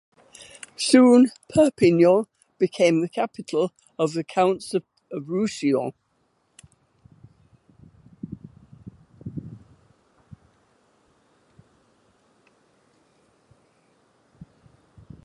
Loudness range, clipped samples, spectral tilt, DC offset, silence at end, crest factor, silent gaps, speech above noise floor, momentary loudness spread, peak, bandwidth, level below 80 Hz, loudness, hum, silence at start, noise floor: 26 LU; under 0.1%; -5.5 dB/octave; under 0.1%; 5.65 s; 22 dB; none; 49 dB; 24 LU; -2 dBFS; 11.5 kHz; -62 dBFS; -21 LUFS; none; 0.8 s; -69 dBFS